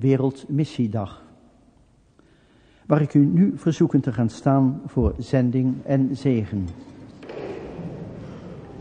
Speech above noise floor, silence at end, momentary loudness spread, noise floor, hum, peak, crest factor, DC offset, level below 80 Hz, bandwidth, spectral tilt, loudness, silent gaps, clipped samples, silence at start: 36 dB; 0 s; 19 LU; -57 dBFS; none; -2 dBFS; 20 dB; under 0.1%; -42 dBFS; 9.4 kHz; -9 dB/octave; -22 LUFS; none; under 0.1%; 0 s